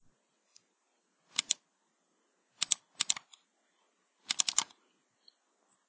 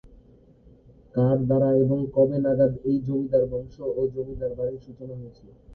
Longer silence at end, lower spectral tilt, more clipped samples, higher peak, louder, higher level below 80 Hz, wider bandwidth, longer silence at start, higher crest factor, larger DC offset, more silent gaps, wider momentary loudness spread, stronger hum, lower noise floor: first, 1.25 s vs 0 s; second, 3 dB/octave vs -12.5 dB/octave; neither; about the same, -6 dBFS vs -6 dBFS; second, -32 LUFS vs -24 LUFS; second, -88 dBFS vs -50 dBFS; first, 8 kHz vs 4.4 kHz; first, 1.4 s vs 0.05 s; first, 34 dB vs 18 dB; neither; neither; second, 8 LU vs 18 LU; neither; first, -77 dBFS vs -54 dBFS